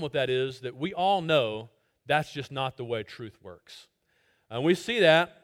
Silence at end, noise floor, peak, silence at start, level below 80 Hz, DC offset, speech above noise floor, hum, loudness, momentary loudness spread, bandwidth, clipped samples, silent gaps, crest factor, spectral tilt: 0.15 s; -70 dBFS; -6 dBFS; 0 s; -68 dBFS; under 0.1%; 42 dB; none; -27 LUFS; 20 LU; 16 kHz; under 0.1%; none; 22 dB; -5.5 dB/octave